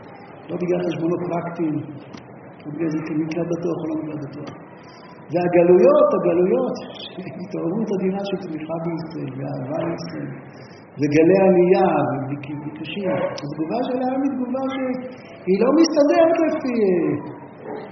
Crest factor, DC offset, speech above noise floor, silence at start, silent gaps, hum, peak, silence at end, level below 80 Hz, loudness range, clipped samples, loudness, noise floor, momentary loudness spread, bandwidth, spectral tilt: 18 dB; under 0.1%; 21 dB; 0 s; none; none; -2 dBFS; 0 s; -62 dBFS; 8 LU; under 0.1%; -20 LUFS; -41 dBFS; 21 LU; 6.4 kHz; -6.5 dB/octave